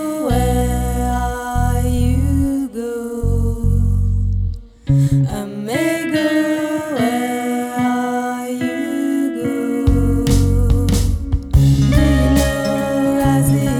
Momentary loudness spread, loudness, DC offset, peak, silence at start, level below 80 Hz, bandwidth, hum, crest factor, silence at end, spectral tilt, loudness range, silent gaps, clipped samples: 7 LU; -17 LUFS; under 0.1%; 0 dBFS; 0 s; -22 dBFS; 17 kHz; none; 14 dB; 0 s; -6.5 dB/octave; 4 LU; none; under 0.1%